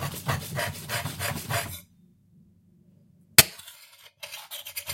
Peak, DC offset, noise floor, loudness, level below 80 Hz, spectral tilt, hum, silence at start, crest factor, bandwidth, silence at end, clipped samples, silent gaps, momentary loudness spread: 0 dBFS; under 0.1%; -60 dBFS; -25 LUFS; -58 dBFS; -2 dB/octave; none; 0 s; 30 dB; 16.5 kHz; 0 s; under 0.1%; none; 24 LU